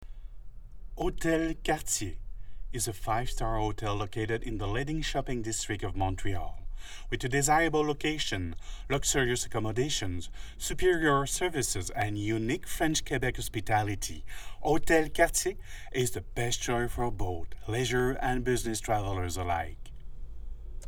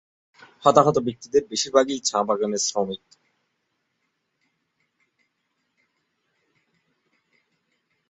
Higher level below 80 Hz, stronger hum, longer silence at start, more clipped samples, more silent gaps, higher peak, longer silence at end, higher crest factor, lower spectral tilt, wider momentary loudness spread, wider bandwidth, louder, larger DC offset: first, -40 dBFS vs -66 dBFS; neither; second, 0 s vs 0.6 s; neither; neither; second, -10 dBFS vs -2 dBFS; second, 0 s vs 5.15 s; about the same, 20 dB vs 24 dB; about the same, -4 dB/octave vs -3.5 dB/octave; first, 17 LU vs 9 LU; first, 19 kHz vs 8.4 kHz; second, -31 LUFS vs -22 LUFS; neither